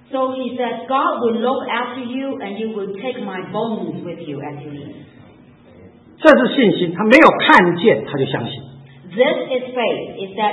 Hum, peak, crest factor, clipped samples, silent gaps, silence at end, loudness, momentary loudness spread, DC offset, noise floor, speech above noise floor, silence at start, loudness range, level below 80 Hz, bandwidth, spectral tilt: none; 0 dBFS; 18 dB; 0.1%; none; 0 s; -16 LUFS; 18 LU; under 0.1%; -45 dBFS; 28 dB; 0.1 s; 13 LU; -56 dBFS; 11 kHz; -6.5 dB/octave